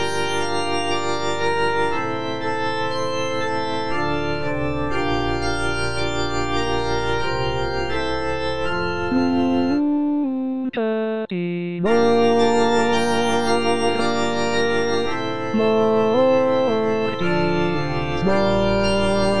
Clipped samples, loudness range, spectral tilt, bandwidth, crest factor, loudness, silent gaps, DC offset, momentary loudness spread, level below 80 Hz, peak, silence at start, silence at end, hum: under 0.1%; 4 LU; -5.5 dB/octave; 10 kHz; 14 dB; -21 LUFS; none; 4%; 7 LU; -40 dBFS; -6 dBFS; 0 s; 0 s; none